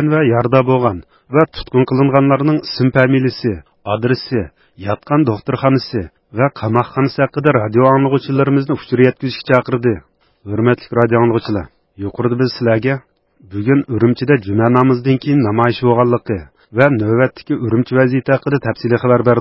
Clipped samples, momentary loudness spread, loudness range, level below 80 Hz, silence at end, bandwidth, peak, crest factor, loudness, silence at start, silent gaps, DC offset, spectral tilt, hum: under 0.1%; 11 LU; 3 LU; -44 dBFS; 0 s; 5.8 kHz; 0 dBFS; 14 dB; -15 LUFS; 0 s; none; under 0.1%; -10 dB/octave; none